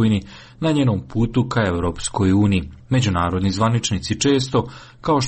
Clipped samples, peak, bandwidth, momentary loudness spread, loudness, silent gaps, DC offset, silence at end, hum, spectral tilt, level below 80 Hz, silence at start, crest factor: under 0.1%; -6 dBFS; 8.8 kHz; 6 LU; -20 LUFS; none; under 0.1%; 0 s; none; -5.5 dB/octave; -40 dBFS; 0 s; 12 dB